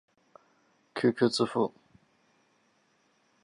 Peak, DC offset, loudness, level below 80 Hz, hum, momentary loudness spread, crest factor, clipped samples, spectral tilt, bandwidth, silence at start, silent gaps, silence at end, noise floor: -12 dBFS; under 0.1%; -29 LUFS; -76 dBFS; none; 8 LU; 22 dB; under 0.1%; -5.5 dB/octave; 11.5 kHz; 0.95 s; none; 1.75 s; -70 dBFS